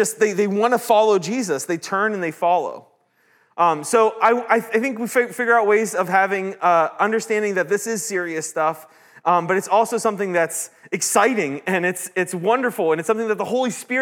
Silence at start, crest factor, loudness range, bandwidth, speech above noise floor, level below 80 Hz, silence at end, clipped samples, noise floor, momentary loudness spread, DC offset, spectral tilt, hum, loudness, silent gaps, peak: 0 s; 18 dB; 3 LU; 18 kHz; 41 dB; -82 dBFS; 0 s; under 0.1%; -60 dBFS; 7 LU; under 0.1%; -4 dB/octave; none; -20 LUFS; none; -2 dBFS